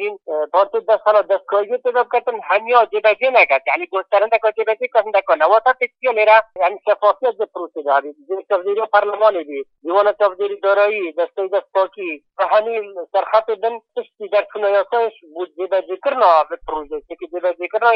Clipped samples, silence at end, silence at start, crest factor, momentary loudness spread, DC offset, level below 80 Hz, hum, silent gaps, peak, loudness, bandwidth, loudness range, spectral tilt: under 0.1%; 0 s; 0 s; 16 dB; 12 LU; under 0.1%; -60 dBFS; none; none; 0 dBFS; -17 LUFS; 5.6 kHz; 4 LU; -5 dB/octave